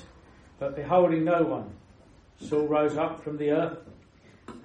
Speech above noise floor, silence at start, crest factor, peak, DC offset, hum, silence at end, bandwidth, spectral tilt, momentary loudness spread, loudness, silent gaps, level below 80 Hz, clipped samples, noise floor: 29 dB; 0 s; 18 dB; -10 dBFS; under 0.1%; none; 0.05 s; 8.8 kHz; -8 dB/octave; 21 LU; -27 LUFS; none; -60 dBFS; under 0.1%; -55 dBFS